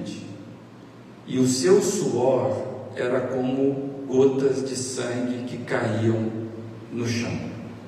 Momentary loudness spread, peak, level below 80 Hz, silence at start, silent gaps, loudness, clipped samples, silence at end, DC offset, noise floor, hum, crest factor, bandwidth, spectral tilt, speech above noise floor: 17 LU; -6 dBFS; -64 dBFS; 0 s; none; -24 LUFS; under 0.1%; 0 s; under 0.1%; -44 dBFS; none; 18 dB; 14.5 kHz; -5.5 dB/octave; 21 dB